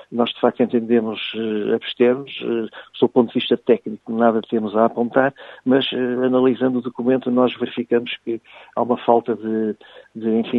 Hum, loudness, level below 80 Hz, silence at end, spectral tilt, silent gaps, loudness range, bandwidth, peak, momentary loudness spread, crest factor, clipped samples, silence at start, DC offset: none; -20 LUFS; -68 dBFS; 0 s; -8.5 dB/octave; none; 2 LU; 4.3 kHz; 0 dBFS; 9 LU; 20 dB; under 0.1%; 0.1 s; under 0.1%